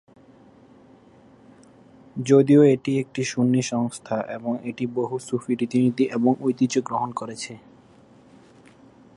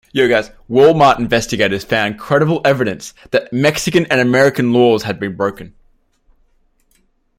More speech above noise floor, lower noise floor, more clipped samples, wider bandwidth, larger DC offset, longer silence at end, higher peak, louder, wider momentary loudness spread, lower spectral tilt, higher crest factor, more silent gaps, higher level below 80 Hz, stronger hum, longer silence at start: second, 30 dB vs 44 dB; second, -52 dBFS vs -58 dBFS; neither; second, 11 kHz vs 16.5 kHz; neither; about the same, 1.6 s vs 1.7 s; second, -4 dBFS vs 0 dBFS; second, -22 LUFS vs -14 LUFS; first, 14 LU vs 8 LU; first, -6.5 dB/octave vs -5 dB/octave; about the same, 18 dB vs 14 dB; neither; second, -68 dBFS vs -46 dBFS; neither; first, 2.15 s vs 0.15 s